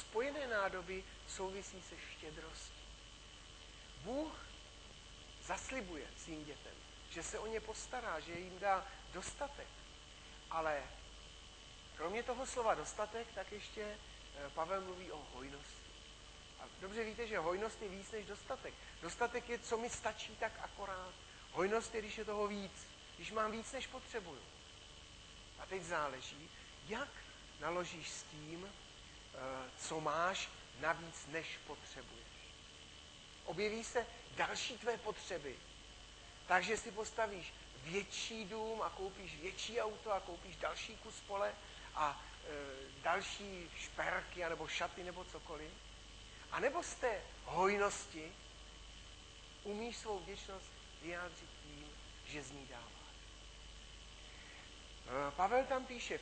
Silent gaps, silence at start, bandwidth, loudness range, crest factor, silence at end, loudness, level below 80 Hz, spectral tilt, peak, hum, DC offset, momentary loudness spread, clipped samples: none; 0 s; 9 kHz; 7 LU; 26 dB; 0 s; -43 LUFS; -62 dBFS; -3 dB/octave; -20 dBFS; none; under 0.1%; 16 LU; under 0.1%